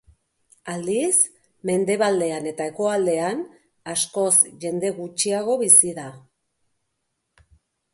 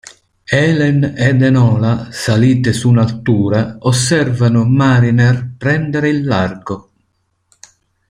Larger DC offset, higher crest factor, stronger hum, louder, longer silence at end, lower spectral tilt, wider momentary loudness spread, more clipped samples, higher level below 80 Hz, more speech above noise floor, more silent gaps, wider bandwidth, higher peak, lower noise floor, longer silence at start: neither; first, 22 dB vs 12 dB; neither; second, -20 LUFS vs -13 LUFS; first, 1.75 s vs 1.3 s; second, -2.5 dB/octave vs -6.5 dB/octave; first, 19 LU vs 6 LU; neither; second, -66 dBFS vs -46 dBFS; about the same, 55 dB vs 52 dB; neither; about the same, 12 kHz vs 11.5 kHz; about the same, 0 dBFS vs -2 dBFS; first, -76 dBFS vs -64 dBFS; first, 0.65 s vs 0.5 s